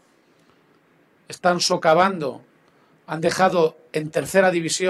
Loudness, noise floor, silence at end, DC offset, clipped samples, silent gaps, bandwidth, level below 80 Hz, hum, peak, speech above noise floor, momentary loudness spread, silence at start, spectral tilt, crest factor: -20 LUFS; -59 dBFS; 0 s; under 0.1%; under 0.1%; none; 13.5 kHz; -64 dBFS; none; -4 dBFS; 39 dB; 12 LU; 1.3 s; -4 dB/octave; 18 dB